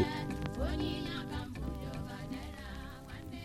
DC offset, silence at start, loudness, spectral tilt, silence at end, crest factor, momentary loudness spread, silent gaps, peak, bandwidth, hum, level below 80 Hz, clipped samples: under 0.1%; 0 s; -40 LUFS; -6 dB/octave; 0 s; 20 dB; 10 LU; none; -18 dBFS; 16.5 kHz; none; -46 dBFS; under 0.1%